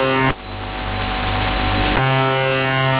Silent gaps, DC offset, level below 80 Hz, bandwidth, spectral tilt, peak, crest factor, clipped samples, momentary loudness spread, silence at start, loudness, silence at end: none; under 0.1%; -30 dBFS; 4 kHz; -9.5 dB/octave; -6 dBFS; 12 dB; under 0.1%; 9 LU; 0 s; -19 LUFS; 0 s